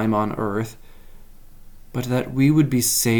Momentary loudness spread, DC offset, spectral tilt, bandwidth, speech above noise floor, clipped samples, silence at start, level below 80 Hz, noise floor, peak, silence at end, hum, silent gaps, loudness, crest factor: 13 LU; under 0.1%; -5 dB/octave; 19.5 kHz; 21 dB; under 0.1%; 0 s; -44 dBFS; -41 dBFS; -6 dBFS; 0 s; none; none; -21 LUFS; 16 dB